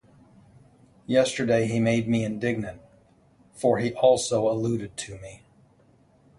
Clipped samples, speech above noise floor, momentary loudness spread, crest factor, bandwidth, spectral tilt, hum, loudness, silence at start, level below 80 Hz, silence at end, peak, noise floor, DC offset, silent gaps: under 0.1%; 35 dB; 17 LU; 20 dB; 11.5 kHz; -5.5 dB/octave; none; -24 LUFS; 1.1 s; -58 dBFS; 1.05 s; -8 dBFS; -59 dBFS; under 0.1%; none